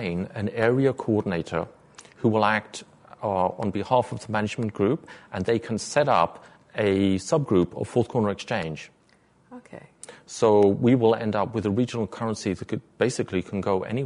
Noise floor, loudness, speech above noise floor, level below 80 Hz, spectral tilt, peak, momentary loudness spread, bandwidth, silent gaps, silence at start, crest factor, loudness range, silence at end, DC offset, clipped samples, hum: -60 dBFS; -25 LUFS; 36 dB; -58 dBFS; -6 dB/octave; -6 dBFS; 13 LU; 11 kHz; none; 0 s; 18 dB; 3 LU; 0 s; under 0.1%; under 0.1%; none